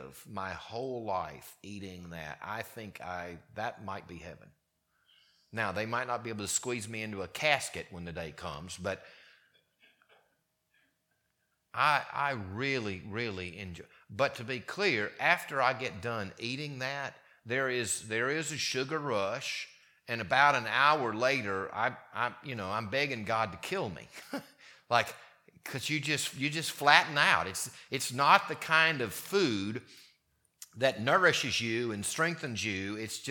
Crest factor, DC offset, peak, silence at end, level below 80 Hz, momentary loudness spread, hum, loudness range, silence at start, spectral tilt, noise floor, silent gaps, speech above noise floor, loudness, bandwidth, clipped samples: 30 dB; under 0.1%; -4 dBFS; 0 s; -68 dBFS; 17 LU; none; 13 LU; 0 s; -3 dB/octave; -79 dBFS; none; 46 dB; -31 LUFS; 19 kHz; under 0.1%